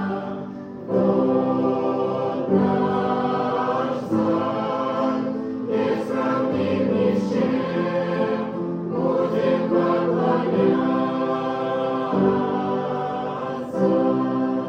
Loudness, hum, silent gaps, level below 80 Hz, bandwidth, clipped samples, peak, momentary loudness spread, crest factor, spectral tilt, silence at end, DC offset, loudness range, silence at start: -22 LUFS; none; none; -62 dBFS; 8.2 kHz; under 0.1%; -6 dBFS; 7 LU; 16 dB; -8.5 dB/octave; 0 s; under 0.1%; 2 LU; 0 s